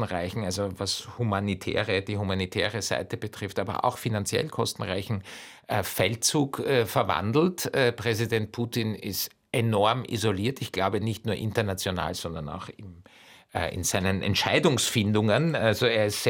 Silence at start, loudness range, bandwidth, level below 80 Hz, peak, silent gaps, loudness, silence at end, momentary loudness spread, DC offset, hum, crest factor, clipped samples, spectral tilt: 0 s; 4 LU; 17 kHz; -58 dBFS; -8 dBFS; none; -27 LUFS; 0 s; 9 LU; under 0.1%; none; 18 dB; under 0.1%; -4.5 dB/octave